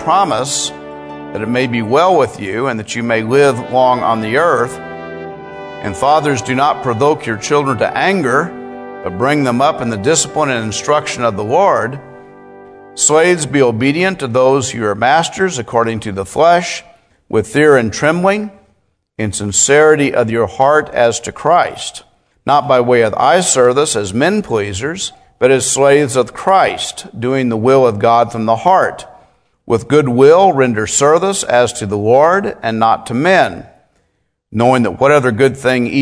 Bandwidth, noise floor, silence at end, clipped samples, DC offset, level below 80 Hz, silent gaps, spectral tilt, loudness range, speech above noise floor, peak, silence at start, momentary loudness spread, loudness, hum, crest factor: 11 kHz; -64 dBFS; 0 s; under 0.1%; under 0.1%; -50 dBFS; none; -4 dB/octave; 3 LU; 52 dB; 0 dBFS; 0 s; 12 LU; -13 LUFS; none; 14 dB